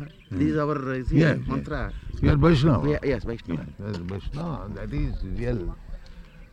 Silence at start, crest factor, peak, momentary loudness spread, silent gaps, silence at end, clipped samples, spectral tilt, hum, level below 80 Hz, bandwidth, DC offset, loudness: 0 s; 18 dB; -6 dBFS; 14 LU; none; 0.1 s; under 0.1%; -8.5 dB/octave; none; -34 dBFS; 8.6 kHz; under 0.1%; -26 LUFS